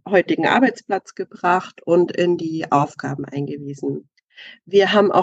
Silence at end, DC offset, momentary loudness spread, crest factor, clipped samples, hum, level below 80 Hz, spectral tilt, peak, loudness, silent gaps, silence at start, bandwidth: 0 s; under 0.1%; 12 LU; 18 dB; under 0.1%; none; -68 dBFS; -6 dB/octave; -2 dBFS; -19 LUFS; 4.24-4.28 s; 0.05 s; 8 kHz